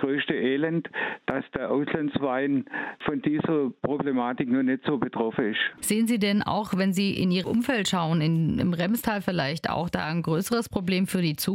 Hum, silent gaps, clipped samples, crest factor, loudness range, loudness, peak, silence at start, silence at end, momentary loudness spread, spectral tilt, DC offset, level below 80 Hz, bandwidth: none; none; under 0.1%; 16 dB; 3 LU; -26 LUFS; -10 dBFS; 0 s; 0 s; 4 LU; -5.5 dB/octave; under 0.1%; -56 dBFS; 16.5 kHz